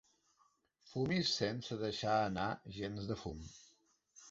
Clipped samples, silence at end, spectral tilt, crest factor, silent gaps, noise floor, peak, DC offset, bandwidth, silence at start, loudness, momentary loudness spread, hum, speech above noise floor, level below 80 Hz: under 0.1%; 0 s; -4 dB/octave; 20 dB; none; -76 dBFS; -20 dBFS; under 0.1%; 8 kHz; 0.85 s; -38 LUFS; 13 LU; none; 37 dB; -62 dBFS